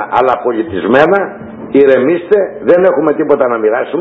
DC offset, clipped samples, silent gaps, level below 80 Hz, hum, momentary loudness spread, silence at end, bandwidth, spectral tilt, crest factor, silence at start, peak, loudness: under 0.1%; 0.6%; none; -48 dBFS; none; 6 LU; 0 s; 5 kHz; -8 dB/octave; 10 dB; 0 s; 0 dBFS; -11 LUFS